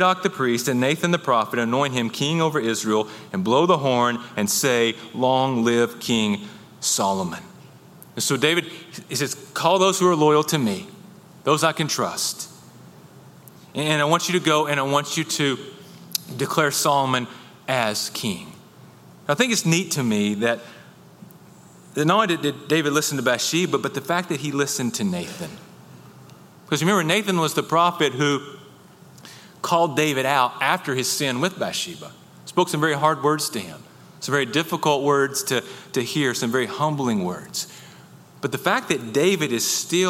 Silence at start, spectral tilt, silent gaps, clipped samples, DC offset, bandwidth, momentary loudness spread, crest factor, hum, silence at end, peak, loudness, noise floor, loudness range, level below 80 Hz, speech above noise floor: 0 s; -4 dB/octave; none; under 0.1%; under 0.1%; 17 kHz; 11 LU; 20 dB; none; 0 s; -2 dBFS; -22 LUFS; -47 dBFS; 3 LU; -68 dBFS; 26 dB